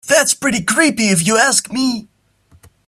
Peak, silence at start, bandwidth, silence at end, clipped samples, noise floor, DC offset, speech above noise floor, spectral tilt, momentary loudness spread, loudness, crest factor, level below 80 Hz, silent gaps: 0 dBFS; 0.05 s; 15.5 kHz; 0.85 s; under 0.1%; -52 dBFS; under 0.1%; 38 dB; -2.5 dB/octave; 7 LU; -14 LUFS; 16 dB; -54 dBFS; none